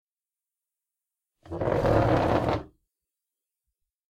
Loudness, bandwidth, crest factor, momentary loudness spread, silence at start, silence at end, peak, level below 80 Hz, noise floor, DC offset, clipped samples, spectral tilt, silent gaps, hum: -25 LUFS; 13.5 kHz; 20 dB; 10 LU; 1.5 s; 1.45 s; -10 dBFS; -44 dBFS; under -90 dBFS; under 0.1%; under 0.1%; -8 dB/octave; none; none